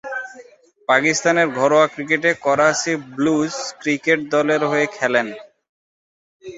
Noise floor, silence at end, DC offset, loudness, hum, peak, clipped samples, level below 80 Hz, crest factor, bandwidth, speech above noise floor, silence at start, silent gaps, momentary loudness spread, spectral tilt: -46 dBFS; 0 s; under 0.1%; -18 LUFS; none; -2 dBFS; under 0.1%; -64 dBFS; 18 dB; 8 kHz; 28 dB; 0.05 s; 5.69-6.40 s; 13 LU; -4 dB/octave